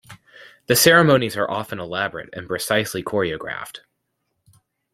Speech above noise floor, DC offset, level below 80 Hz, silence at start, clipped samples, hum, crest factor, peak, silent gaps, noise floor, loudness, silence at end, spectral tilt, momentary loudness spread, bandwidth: 54 dB; under 0.1%; -58 dBFS; 0.1 s; under 0.1%; none; 20 dB; -2 dBFS; none; -74 dBFS; -19 LUFS; 1.15 s; -3.5 dB/octave; 17 LU; 16.5 kHz